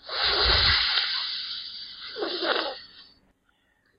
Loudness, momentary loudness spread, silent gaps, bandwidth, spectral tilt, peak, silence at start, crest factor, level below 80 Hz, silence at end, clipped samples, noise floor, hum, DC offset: -23 LUFS; 17 LU; none; 5.4 kHz; -6.5 dB/octave; -6 dBFS; 0.05 s; 20 dB; -42 dBFS; 0.95 s; under 0.1%; -68 dBFS; none; under 0.1%